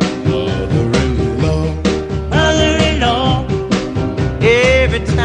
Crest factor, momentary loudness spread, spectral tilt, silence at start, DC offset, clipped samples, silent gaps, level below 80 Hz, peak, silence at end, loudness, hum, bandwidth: 14 dB; 6 LU; -5.5 dB/octave; 0 s; under 0.1%; under 0.1%; none; -24 dBFS; 0 dBFS; 0 s; -14 LUFS; none; 10 kHz